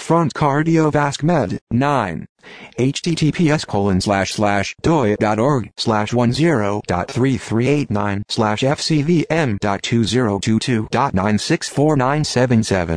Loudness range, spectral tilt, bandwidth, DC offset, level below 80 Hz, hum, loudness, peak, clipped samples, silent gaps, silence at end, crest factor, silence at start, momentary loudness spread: 1 LU; -6 dB/octave; 11 kHz; 0.2%; -44 dBFS; none; -18 LUFS; -2 dBFS; under 0.1%; 1.61-1.67 s, 2.29-2.35 s; 0 s; 14 dB; 0 s; 5 LU